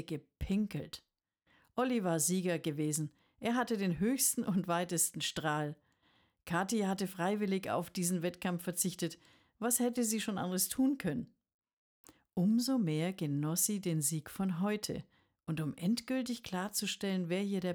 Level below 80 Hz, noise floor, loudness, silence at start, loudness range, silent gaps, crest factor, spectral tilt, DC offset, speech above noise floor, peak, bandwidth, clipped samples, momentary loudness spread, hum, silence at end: -62 dBFS; -74 dBFS; -35 LUFS; 0 s; 3 LU; 11.54-11.59 s, 11.73-12.04 s; 18 dB; -4.5 dB/octave; under 0.1%; 39 dB; -18 dBFS; over 20 kHz; under 0.1%; 11 LU; none; 0 s